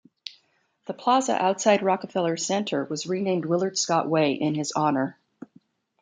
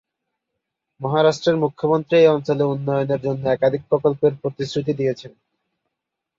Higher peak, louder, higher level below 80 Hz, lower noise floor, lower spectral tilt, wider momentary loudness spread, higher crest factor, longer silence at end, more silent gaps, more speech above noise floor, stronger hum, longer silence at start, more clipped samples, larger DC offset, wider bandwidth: second, -8 dBFS vs -4 dBFS; second, -24 LUFS vs -20 LUFS; second, -74 dBFS vs -60 dBFS; second, -67 dBFS vs -82 dBFS; second, -4.5 dB/octave vs -7 dB/octave; first, 12 LU vs 9 LU; about the same, 18 dB vs 18 dB; second, 0.9 s vs 1.1 s; neither; second, 43 dB vs 63 dB; neither; second, 0.25 s vs 1 s; neither; neither; first, 9.6 kHz vs 7.6 kHz